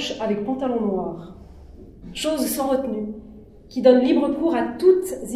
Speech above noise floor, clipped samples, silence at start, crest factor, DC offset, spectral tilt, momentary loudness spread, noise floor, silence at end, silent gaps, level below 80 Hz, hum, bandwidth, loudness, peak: 22 dB; under 0.1%; 0 s; 20 dB; under 0.1%; -5 dB/octave; 17 LU; -43 dBFS; 0 s; none; -50 dBFS; none; 15.5 kHz; -21 LUFS; -2 dBFS